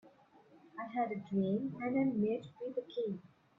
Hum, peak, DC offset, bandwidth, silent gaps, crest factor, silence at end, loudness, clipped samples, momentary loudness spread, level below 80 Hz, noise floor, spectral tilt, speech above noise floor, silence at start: none; -22 dBFS; under 0.1%; 5.8 kHz; none; 14 dB; 0.3 s; -37 LUFS; under 0.1%; 10 LU; -78 dBFS; -64 dBFS; -9.5 dB/octave; 28 dB; 0.05 s